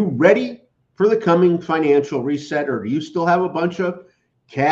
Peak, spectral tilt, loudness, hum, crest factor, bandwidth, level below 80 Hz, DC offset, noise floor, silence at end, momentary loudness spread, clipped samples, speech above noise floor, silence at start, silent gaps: -2 dBFS; -7 dB/octave; -18 LUFS; none; 18 dB; 7.6 kHz; -64 dBFS; under 0.1%; -46 dBFS; 0 s; 10 LU; under 0.1%; 29 dB; 0 s; none